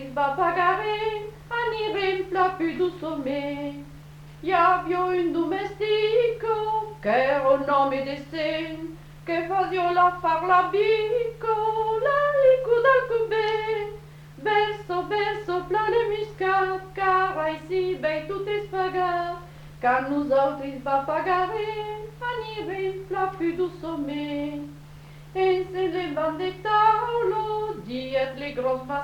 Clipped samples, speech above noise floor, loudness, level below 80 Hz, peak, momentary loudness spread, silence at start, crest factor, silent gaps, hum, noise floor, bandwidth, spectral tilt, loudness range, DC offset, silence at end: under 0.1%; 20 dB; -25 LUFS; -52 dBFS; -8 dBFS; 11 LU; 0 s; 16 dB; none; none; -44 dBFS; 18.5 kHz; -6 dB/octave; 6 LU; under 0.1%; 0 s